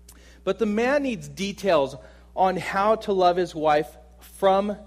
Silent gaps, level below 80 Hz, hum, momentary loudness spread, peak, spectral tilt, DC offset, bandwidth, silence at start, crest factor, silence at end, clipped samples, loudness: none; -50 dBFS; none; 10 LU; -6 dBFS; -5.5 dB/octave; under 0.1%; 15.5 kHz; 0.45 s; 16 dB; 0 s; under 0.1%; -23 LUFS